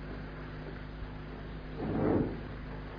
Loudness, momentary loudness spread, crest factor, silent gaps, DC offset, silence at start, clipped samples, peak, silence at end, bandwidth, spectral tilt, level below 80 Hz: -37 LUFS; 13 LU; 20 dB; none; under 0.1%; 0 s; under 0.1%; -18 dBFS; 0 s; 5.2 kHz; -7 dB/octave; -46 dBFS